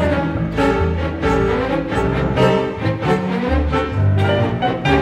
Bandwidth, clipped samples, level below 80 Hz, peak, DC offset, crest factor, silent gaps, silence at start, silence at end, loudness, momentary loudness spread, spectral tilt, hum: 11 kHz; under 0.1%; -28 dBFS; -2 dBFS; under 0.1%; 14 dB; none; 0 s; 0 s; -18 LUFS; 4 LU; -7.5 dB/octave; none